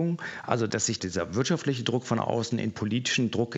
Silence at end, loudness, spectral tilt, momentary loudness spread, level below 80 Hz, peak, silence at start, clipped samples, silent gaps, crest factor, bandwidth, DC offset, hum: 0 s; -28 LUFS; -4.5 dB/octave; 4 LU; -66 dBFS; -6 dBFS; 0 s; under 0.1%; none; 22 dB; 8.2 kHz; under 0.1%; none